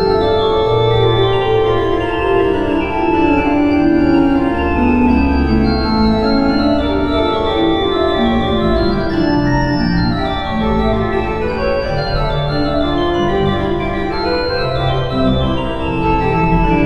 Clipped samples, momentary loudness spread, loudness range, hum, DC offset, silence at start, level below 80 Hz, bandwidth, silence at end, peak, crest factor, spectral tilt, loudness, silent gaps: under 0.1%; 5 LU; 3 LU; none; 2%; 0 s; -24 dBFS; 8.4 kHz; 0 s; -2 dBFS; 12 dB; -8 dB/octave; -15 LUFS; none